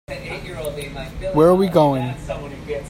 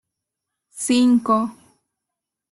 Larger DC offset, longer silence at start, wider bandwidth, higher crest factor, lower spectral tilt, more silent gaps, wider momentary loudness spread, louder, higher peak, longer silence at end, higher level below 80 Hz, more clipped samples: neither; second, 0.1 s vs 0.75 s; first, 16 kHz vs 12.5 kHz; about the same, 18 dB vs 16 dB; first, -7 dB/octave vs -4 dB/octave; neither; first, 16 LU vs 13 LU; about the same, -19 LUFS vs -19 LUFS; first, -2 dBFS vs -6 dBFS; second, 0 s vs 1 s; first, -38 dBFS vs -64 dBFS; neither